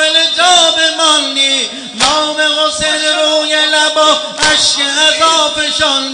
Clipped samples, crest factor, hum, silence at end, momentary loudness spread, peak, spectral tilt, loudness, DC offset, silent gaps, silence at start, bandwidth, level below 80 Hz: under 0.1%; 12 dB; none; 0 s; 4 LU; 0 dBFS; 0 dB/octave; -9 LUFS; under 0.1%; none; 0 s; 10 kHz; -44 dBFS